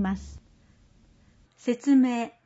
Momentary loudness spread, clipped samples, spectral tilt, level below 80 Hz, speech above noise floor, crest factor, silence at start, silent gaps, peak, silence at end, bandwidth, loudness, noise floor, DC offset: 14 LU; under 0.1%; -6.5 dB/octave; -52 dBFS; 35 dB; 16 dB; 0 s; none; -12 dBFS; 0.15 s; 8 kHz; -25 LUFS; -59 dBFS; under 0.1%